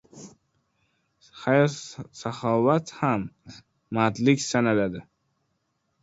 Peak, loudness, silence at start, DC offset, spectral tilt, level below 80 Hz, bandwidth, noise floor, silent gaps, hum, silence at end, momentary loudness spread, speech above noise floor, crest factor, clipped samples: -6 dBFS; -24 LUFS; 0.15 s; under 0.1%; -5.5 dB/octave; -62 dBFS; 8 kHz; -75 dBFS; none; none; 1 s; 14 LU; 50 dB; 22 dB; under 0.1%